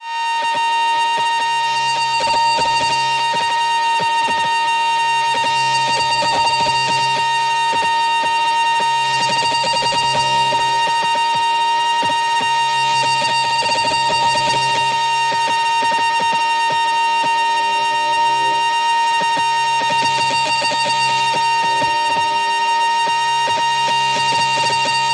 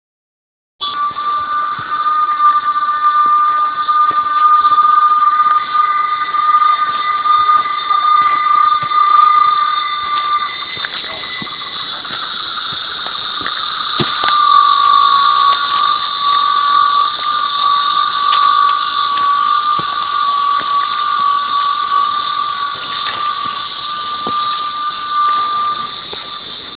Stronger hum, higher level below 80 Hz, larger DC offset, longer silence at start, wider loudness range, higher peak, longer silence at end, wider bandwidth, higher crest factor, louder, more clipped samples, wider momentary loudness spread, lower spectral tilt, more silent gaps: neither; about the same, -56 dBFS vs -56 dBFS; second, under 0.1% vs 0.1%; second, 0 s vs 0.8 s; second, 0 LU vs 6 LU; second, -4 dBFS vs 0 dBFS; about the same, 0 s vs 0.05 s; first, 11 kHz vs 4 kHz; about the same, 12 dB vs 14 dB; second, -16 LUFS vs -13 LUFS; neither; second, 1 LU vs 10 LU; second, -1 dB/octave vs -5 dB/octave; neither